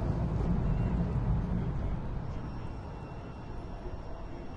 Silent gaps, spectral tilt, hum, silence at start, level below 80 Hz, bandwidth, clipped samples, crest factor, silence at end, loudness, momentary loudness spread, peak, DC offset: none; -9.5 dB/octave; none; 0 s; -38 dBFS; 7 kHz; under 0.1%; 14 dB; 0 s; -35 LUFS; 12 LU; -20 dBFS; under 0.1%